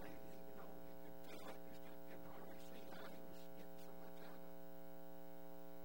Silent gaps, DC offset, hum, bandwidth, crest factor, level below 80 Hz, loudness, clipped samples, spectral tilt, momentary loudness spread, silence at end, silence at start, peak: none; 0.4%; 60 Hz at -65 dBFS; over 20 kHz; 16 dB; -74 dBFS; -58 LUFS; under 0.1%; -5.5 dB/octave; 3 LU; 0 s; 0 s; -38 dBFS